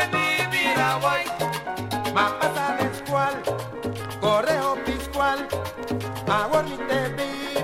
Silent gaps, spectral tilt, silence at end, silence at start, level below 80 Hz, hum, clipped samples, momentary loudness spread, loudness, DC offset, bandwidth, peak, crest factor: none; -4.5 dB/octave; 0 s; 0 s; -48 dBFS; none; under 0.1%; 9 LU; -24 LUFS; under 0.1%; 16 kHz; -6 dBFS; 18 dB